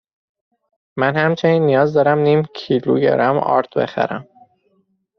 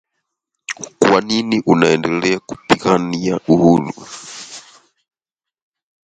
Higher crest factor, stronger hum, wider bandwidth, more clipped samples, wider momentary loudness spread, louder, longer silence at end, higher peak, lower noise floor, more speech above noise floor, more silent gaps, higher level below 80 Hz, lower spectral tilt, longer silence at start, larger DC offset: about the same, 16 dB vs 18 dB; neither; second, 6.4 kHz vs 11 kHz; neither; second, 7 LU vs 18 LU; about the same, -16 LUFS vs -15 LUFS; second, 0.95 s vs 1.45 s; about the same, -2 dBFS vs 0 dBFS; second, -63 dBFS vs -88 dBFS; second, 47 dB vs 72 dB; neither; second, -60 dBFS vs -52 dBFS; about the same, -5.5 dB/octave vs -5.5 dB/octave; first, 0.95 s vs 0.7 s; neither